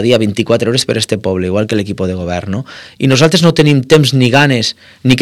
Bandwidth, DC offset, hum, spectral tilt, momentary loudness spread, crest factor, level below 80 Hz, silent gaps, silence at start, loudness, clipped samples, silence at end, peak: 15 kHz; under 0.1%; none; -5.5 dB/octave; 10 LU; 12 dB; -44 dBFS; none; 0 s; -12 LUFS; 1%; 0 s; 0 dBFS